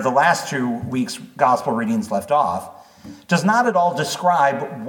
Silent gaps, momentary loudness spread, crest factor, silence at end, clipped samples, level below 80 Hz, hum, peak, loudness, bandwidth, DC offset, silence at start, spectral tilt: none; 8 LU; 18 dB; 0 s; under 0.1%; -62 dBFS; none; -2 dBFS; -19 LUFS; 19 kHz; under 0.1%; 0 s; -5 dB/octave